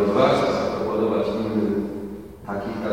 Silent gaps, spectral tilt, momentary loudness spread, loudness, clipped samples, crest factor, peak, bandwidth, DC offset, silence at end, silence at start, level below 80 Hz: none; -6.5 dB/octave; 14 LU; -23 LUFS; under 0.1%; 18 dB; -6 dBFS; 16.5 kHz; 0.2%; 0 s; 0 s; -48 dBFS